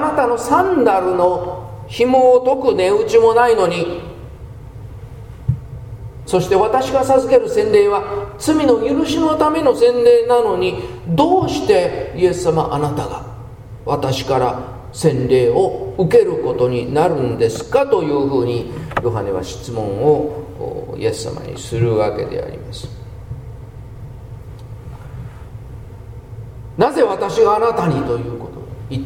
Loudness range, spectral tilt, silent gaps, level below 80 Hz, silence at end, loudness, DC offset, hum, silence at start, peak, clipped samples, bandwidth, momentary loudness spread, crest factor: 9 LU; -6.5 dB/octave; none; -40 dBFS; 0 s; -16 LUFS; under 0.1%; none; 0 s; 0 dBFS; under 0.1%; 16 kHz; 22 LU; 16 dB